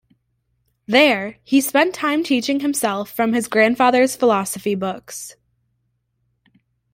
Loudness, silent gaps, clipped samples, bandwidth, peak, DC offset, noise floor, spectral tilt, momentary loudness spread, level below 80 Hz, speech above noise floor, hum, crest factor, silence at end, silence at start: -18 LUFS; none; under 0.1%; 16.5 kHz; 0 dBFS; under 0.1%; -70 dBFS; -3.5 dB/octave; 11 LU; -62 dBFS; 52 dB; none; 20 dB; 1.6 s; 0.9 s